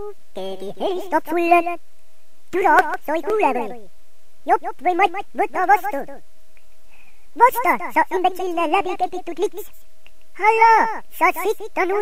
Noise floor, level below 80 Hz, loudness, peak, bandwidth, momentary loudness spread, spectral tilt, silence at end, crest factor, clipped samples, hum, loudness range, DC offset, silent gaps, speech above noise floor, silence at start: -59 dBFS; -58 dBFS; -19 LUFS; 0 dBFS; 16 kHz; 15 LU; -4 dB/octave; 0 s; 20 dB; under 0.1%; none; 3 LU; 4%; none; 40 dB; 0 s